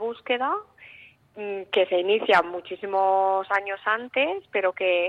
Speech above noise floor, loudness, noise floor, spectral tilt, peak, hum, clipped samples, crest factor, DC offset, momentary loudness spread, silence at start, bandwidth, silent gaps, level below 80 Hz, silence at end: 27 dB; -24 LUFS; -51 dBFS; -4.5 dB/octave; -8 dBFS; none; under 0.1%; 18 dB; under 0.1%; 11 LU; 0 s; 8.8 kHz; none; -72 dBFS; 0 s